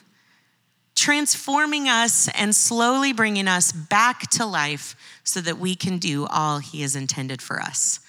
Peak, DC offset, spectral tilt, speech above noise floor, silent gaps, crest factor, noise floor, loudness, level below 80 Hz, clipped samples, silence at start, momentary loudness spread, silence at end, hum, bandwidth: -4 dBFS; under 0.1%; -2 dB/octave; 44 dB; none; 18 dB; -66 dBFS; -20 LUFS; -80 dBFS; under 0.1%; 0.95 s; 9 LU; 0.1 s; none; over 20 kHz